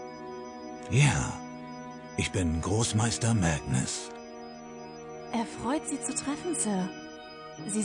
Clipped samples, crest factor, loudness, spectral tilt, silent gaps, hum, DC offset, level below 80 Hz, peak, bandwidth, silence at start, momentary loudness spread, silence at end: under 0.1%; 20 dB; -29 LUFS; -4.5 dB/octave; none; none; under 0.1%; -50 dBFS; -12 dBFS; 10.5 kHz; 0 s; 17 LU; 0 s